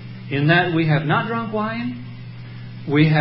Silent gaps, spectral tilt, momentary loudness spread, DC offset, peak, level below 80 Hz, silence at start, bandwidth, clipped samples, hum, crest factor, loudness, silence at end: none; -12 dB/octave; 19 LU; under 0.1%; -2 dBFS; -54 dBFS; 0 s; 5.6 kHz; under 0.1%; none; 18 dB; -20 LUFS; 0 s